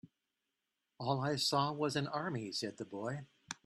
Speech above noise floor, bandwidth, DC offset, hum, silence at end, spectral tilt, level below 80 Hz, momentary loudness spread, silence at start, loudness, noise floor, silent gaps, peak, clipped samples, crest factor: 51 dB; 13 kHz; under 0.1%; none; 0.1 s; -4.5 dB/octave; -76 dBFS; 10 LU; 0.05 s; -37 LUFS; -88 dBFS; none; -20 dBFS; under 0.1%; 18 dB